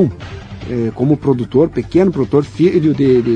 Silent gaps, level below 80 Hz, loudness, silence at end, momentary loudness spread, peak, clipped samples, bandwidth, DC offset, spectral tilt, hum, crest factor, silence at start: none; -40 dBFS; -14 LUFS; 0 s; 11 LU; 0 dBFS; under 0.1%; 8.8 kHz; under 0.1%; -9 dB/octave; none; 14 dB; 0 s